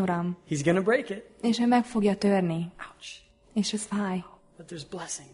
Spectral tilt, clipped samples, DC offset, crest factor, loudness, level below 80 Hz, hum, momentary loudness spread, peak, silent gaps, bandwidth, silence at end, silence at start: -5.5 dB/octave; under 0.1%; under 0.1%; 16 dB; -27 LUFS; -62 dBFS; none; 18 LU; -12 dBFS; none; 11 kHz; 0.1 s; 0 s